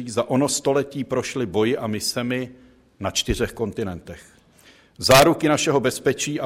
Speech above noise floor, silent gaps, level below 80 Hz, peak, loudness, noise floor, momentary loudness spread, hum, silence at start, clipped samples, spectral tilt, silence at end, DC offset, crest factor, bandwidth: 31 dB; none; -44 dBFS; -4 dBFS; -21 LUFS; -53 dBFS; 15 LU; none; 0 s; under 0.1%; -4 dB/octave; 0 s; under 0.1%; 18 dB; 16 kHz